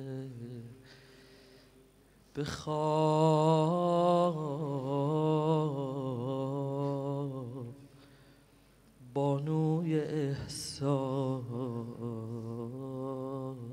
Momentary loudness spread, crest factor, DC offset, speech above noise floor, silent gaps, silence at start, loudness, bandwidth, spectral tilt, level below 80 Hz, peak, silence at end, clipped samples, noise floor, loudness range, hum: 14 LU; 20 dB; under 0.1%; 34 dB; none; 0 s; -33 LUFS; 12 kHz; -7.5 dB/octave; -66 dBFS; -14 dBFS; 0 s; under 0.1%; -62 dBFS; 8 LU; 50 Hz at -65 dBFS